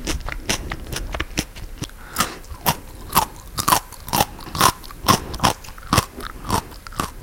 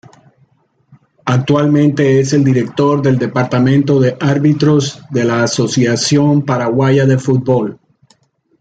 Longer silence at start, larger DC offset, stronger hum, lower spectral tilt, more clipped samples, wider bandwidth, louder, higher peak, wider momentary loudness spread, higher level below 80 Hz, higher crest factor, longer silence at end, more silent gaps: second, 0 s vs 1.25 s; neither; neither; second, -3 dB/octave vs -6.5 dB/octave; neither; first, 17 kHz vs 9.2 kHz; second, -22 LUFS vs -13 LUFS; about the same, 0 dBFS vs 0 dBFS; first, 13 LU vs 5 LU; first, -34 dBFS vs -52 dBFS; first, 24 dB vs 12 dB; second, 0 s vs 0.85 s; neither